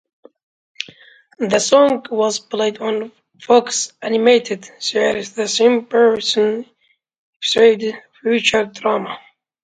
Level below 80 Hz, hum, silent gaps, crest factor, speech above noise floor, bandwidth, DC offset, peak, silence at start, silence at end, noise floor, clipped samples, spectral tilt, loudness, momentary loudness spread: -62 dBFS; none; 7.18-7.40 s; 18 dB; 30 dB; 9.4 kHz; under 0.1%; 0 dBFS; 0.8 s; 0.45 s; -46 dBFS; under 0.1%; -2.5 dB/octave; -17 LUFS; 14 LU